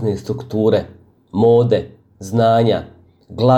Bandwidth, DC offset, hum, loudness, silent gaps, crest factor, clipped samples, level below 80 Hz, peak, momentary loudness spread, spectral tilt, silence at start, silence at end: 12.5 kHz; under 0.1%; none; -17 LUFS; none; 14 dB; under 0.1%; -48 dBFS; -2 dBFS; 22 LU; -8 dB/octave; 0 s; 0 s